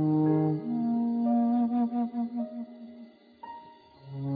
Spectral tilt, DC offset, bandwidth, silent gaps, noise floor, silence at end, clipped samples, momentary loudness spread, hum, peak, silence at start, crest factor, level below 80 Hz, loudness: -12.5 dB/octave; under 0.1%; 4.8 kHz; none; -52 dBFS; 0 s; under 0.1%; 21 LU; none; -14 dBFS; 0 s; 14 dB; -74 dBFS; -28 LUFS